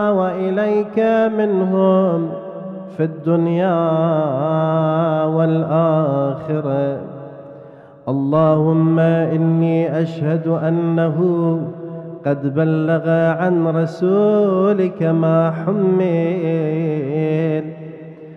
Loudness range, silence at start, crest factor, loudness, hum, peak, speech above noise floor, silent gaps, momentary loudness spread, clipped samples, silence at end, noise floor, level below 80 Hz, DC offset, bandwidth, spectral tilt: 2 LU; 0 s; 14 dB; -17 LUFS; none; -2 dBFS; 24 dB; none; 11 LU; under 0.1%; 0 s; -40 dBFS; -64 dBFS; under 0.1%; 5 kHz; -10 dB/octave